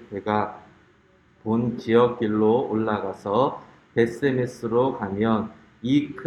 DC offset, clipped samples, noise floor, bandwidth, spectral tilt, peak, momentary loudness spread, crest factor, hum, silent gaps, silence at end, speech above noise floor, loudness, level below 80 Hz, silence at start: under 0.1%; under 0.1%; -58 dBFS; 11 kHz; -7.5 dB/octave; -4 dBFS; 9 LU; 18 dB; none; none; 0 s; 35 dB; -24 LUFS; -60 dBFS; 0 s